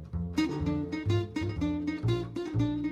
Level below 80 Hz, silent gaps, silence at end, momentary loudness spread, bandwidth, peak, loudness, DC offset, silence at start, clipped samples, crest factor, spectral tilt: -46 dBFS; none; 0 s; 3 LU; 11 kHz; -16 dBFS; -32 LUFS; under 0.1%; 0 s; under 0.1%; 14 dB; -7.5 dB/octave